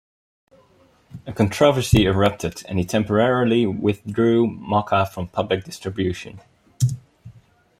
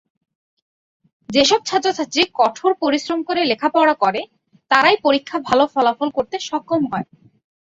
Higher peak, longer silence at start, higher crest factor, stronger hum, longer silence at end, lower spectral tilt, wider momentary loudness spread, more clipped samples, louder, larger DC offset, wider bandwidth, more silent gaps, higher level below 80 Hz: about the same, -2 dBFS vs -2 dBFS; second, 1.15 s vs 1.3 s; about the same, 20 dB vs 18 dB; neither; about the same, 0.5 s vs 0.6 s; first, -6 dB/octave vs -3 dB/octave; first, 12 LU vs 9 LU; neither; about the same, -20 LUFS vs -18 LUFS; neither; first, 16 kHz vs 8 kHz; neither; first, -44 dBFS vs -60 dBFS